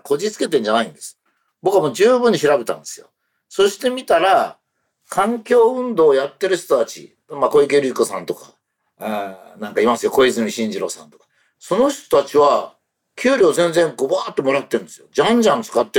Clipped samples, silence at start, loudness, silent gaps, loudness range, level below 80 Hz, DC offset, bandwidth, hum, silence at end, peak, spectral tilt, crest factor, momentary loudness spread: under 0.1%; 0.05 s; -17 LUFS; none; 3 LU; -60 dBFS; under 0.1%; 18 kHz; none; 0 s; -6 dBFS; -4 dB/octave; 12 dB; 14 LU